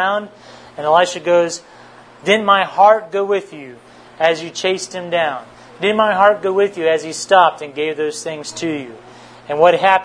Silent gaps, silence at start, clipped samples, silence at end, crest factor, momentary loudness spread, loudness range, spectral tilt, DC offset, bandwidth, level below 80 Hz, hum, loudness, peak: none; 0 s; under 0.1%; 0 s; 16 dB; 14 LU; 2 LU; -3.5 dB/octave; under 0.1%; 10.5 kHz; -64 dBFS; none; -16 LUFS; 0 dBFS